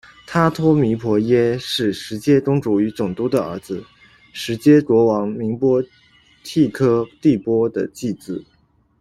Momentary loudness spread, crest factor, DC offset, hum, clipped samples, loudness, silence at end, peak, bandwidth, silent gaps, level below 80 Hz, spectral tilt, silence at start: 14 LU; 16 dB; under 0.1%; none; under 0.1%; -18 LUFS; 0.6 s; -2 dBFS; 13.5 kHz; none; -52 dBFS; -7 dB/octave; 0.3 s